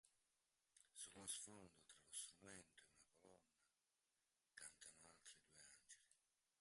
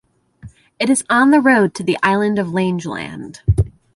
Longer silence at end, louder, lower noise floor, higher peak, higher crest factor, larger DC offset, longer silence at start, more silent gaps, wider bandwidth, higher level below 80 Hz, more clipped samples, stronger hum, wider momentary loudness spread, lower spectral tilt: first, 0.45 s vs 0.25 s; second, -59 LUFS vs -16 LUFS; first, under -90 dBFS vs -41 dBFS; second, -38 dBFS vs -2 dBFS; first, 26 dB vs 16 dB; neither; second, 0.05 s vs 0.45 s; neither; about the same, 11.5 kHz vs 11.5 kHz; second, under -90 dBFS vs -34 dBFS; neither; neither; first, 15 LU vs 12 LU; second, -1 dB/octave vs -5.5 dB/octave